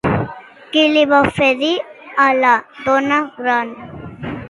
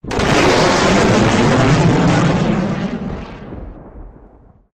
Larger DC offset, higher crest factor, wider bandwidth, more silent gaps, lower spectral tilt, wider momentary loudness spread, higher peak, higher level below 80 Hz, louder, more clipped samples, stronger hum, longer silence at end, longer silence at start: neither; about the same, 16 dB vs 14 dB; about the same, 11.5 kHz vs 12.5 kHz; neither; about the same, -5.5 dB/octave vs -5.5 dB/octave; about the same, 16 LU vs 18 LU; about the same, 0 dBFS vs 0 dBFS; second, -44 dBFS vs -32 dBFS; about the same, -15 LUFS vs -13 LUFS; neither; neither; second, 0 s vs 0.65 s; about the same, 0.05 s vs 0.05 s